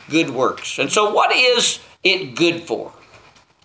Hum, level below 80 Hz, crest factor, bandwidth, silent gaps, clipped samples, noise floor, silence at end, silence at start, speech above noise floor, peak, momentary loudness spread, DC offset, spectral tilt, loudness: none; -64 dBFS; 18 dB; 8 kHz; none; under 0.1%; -49 dBFS; 0.75 s; 0.1 s; 31 dB; 0 dBFS; 12 LU; under 0.1%; -2.5 dB/octave; -17 LUFS